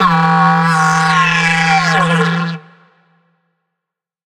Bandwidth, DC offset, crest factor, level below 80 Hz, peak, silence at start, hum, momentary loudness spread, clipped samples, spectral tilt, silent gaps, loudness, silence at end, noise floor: 11 kHz; under 0.1%; 14 dB; -48 dBFS; 0 dBFS; 0 s; none; 7 LU; under 0.1%; -4.5 dB/octave; none; -12 LUFS; 1.7 s; -81 dBFS